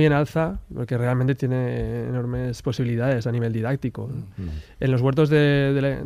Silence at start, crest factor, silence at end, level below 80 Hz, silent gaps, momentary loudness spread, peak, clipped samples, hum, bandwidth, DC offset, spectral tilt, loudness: 0 s; 14 dB; 0 s; -42 dBFS; none; 14 LU; -8 dBFS; under 0.1%; none; 11.5 kHz; under 0.1%; -8 dB/octave; -23 LUFS